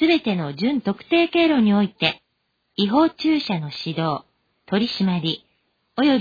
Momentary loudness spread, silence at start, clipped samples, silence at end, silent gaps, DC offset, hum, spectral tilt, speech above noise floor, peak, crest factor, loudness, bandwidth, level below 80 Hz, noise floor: 10 LU; 0 s; under 0.1%; 0 s; none; under 0.1%; none; -7.5 dB/octave; 52 dB; -4 dBFS; 18 dB; -21 LUFS; 5 kHz; -60 dBFS; -72 dBFS